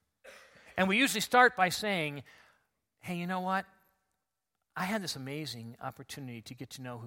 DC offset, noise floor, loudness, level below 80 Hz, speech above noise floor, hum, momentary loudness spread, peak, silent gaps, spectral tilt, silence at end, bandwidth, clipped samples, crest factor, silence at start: under 0.1%; -86 dBFS; -30 LUFS; -72 dBFS; 54 dB; none; 21 LU; -10 dBFS; none; -3.5 dB/octave; 0 s; 16.5 kHz; under 0.1%; 24 dB; 0.25 s